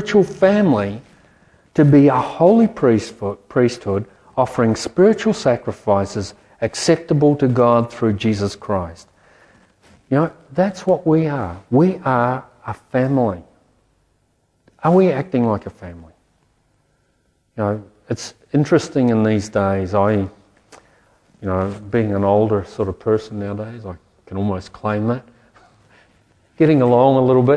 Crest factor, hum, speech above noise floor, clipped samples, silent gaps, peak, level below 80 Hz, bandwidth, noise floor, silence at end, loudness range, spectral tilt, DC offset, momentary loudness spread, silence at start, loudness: 18 dB; none; 47 dB; under 0.1%; none; 0 dBFS; -52 dBFS; 11 kHz; -63 dBFS; 0 s; 6 LU; -7 dB/octave; under 0.1%; 14 LU; 0 s; -18 LUFS